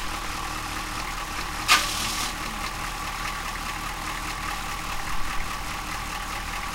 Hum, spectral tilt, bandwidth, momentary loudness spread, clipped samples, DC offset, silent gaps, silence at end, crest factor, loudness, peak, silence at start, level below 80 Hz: none; -1.5 dB/octave; 16 kHz; 10 LU; under 0.1%; under 0.1%; none; 0 s; 24 dB; -28 LUFS; -4 dBFS; 0 s; -38 dBFS